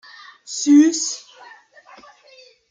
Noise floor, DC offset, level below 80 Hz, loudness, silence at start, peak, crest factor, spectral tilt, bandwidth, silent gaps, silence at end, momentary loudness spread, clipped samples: -50 dBFS; under 0.1%; -80 dBFS; -17 LUFS; 0.5 s; -4 dBFS; 18 dB; -1 dB/octave; 9.4 kHz; none; 1.5 s; 19 LU; under 0.1%